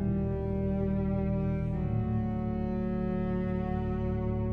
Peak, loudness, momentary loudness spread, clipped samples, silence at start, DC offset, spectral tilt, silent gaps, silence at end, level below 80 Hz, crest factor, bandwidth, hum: -20 dBFS; -31 LUFS; 2 LU; under 0.1%; 0 s; under 0.1%; -11.5 dB/octave; none; 0 s; -38 dBFS; 10 dB; 4.3 kHz; none